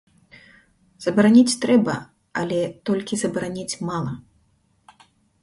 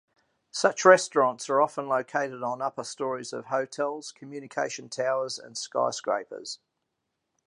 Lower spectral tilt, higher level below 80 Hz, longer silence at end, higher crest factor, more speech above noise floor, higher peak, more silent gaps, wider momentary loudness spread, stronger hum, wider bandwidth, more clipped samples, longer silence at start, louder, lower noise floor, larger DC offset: first, -5 dB/octave vs -3 dB/octave; first, -60 dBFS vs -82 dBFS; first, 1.25 s vs 0.9 s; about the same, 20 dB vs 24 dB; second, 43 dB vs 54 dB; about the same, -4 dBFS vs -4 dBFS; neither; about the same, 15 LU vs 17 LU; neither; about the same, 11.5 kHz vs 11 kHz; neither; first, 1 s vs 0.55 s; first, -21 LUFS vs -27 LUFS; second, -63 dBFS vs -81 dBFS; neither